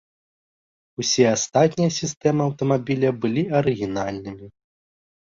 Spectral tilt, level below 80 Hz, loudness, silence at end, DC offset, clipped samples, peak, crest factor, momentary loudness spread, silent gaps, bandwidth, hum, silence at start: -5 dB/octave; -56 dBFS; -21 LUFS; 0.7 s; under 0.1%; under 0.1%; -4 dBFS; 18 dB; 12 LU; 2.17-2.21 s; 7.6 kHz; none; 1 s